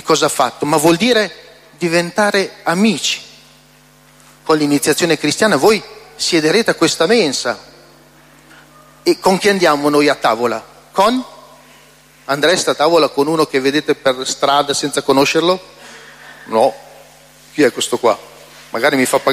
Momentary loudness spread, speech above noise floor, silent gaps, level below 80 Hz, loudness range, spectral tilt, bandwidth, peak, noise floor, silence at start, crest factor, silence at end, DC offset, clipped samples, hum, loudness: 10 LU; 33 dB; none; -56 dBFS; 3 LU; -3.5 dB/octave; 16 kHz; 0 dBFS; -47 dBFS; 0.05 s; 16 dB; 0 s; under 0.1%; under 0.1%; none; -14 LUFS